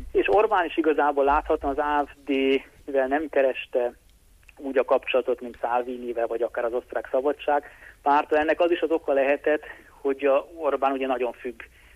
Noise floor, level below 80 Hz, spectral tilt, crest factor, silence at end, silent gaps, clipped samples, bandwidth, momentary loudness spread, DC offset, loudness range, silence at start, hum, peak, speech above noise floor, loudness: -54 dBFS; -50 dBFS; -5.5 dB/octave; 14 dB; 0.3 s; none; under 0.1%; 13.5 kHz; 8 LU; under 0.1%; 3 LU; 0 s; none; -10 dBFS; 30 dB; -25 LUFS